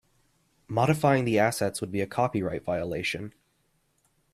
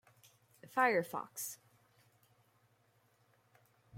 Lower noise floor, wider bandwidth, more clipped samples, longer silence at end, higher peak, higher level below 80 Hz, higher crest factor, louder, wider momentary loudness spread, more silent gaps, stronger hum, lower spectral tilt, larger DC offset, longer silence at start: about the same, -71 dBFS vs -73 dBFS; about the same, 15.5 kHz vs 16.5 kHz; neither; first, 1.05 s vs 0 s; first, -8 dBFS vs -18 dBFS; first, -60 dBFS vs -86 dBFS; about the same, 20 dB vs 24 dB; first, -27 LUFS vs -36 LUFS; second, 9 LU vs 13 LU; neither; neither; first, -5.5 dB/octave vs -3.5 dB/octave; neither; about the same, 0.7 s vs 0.65 s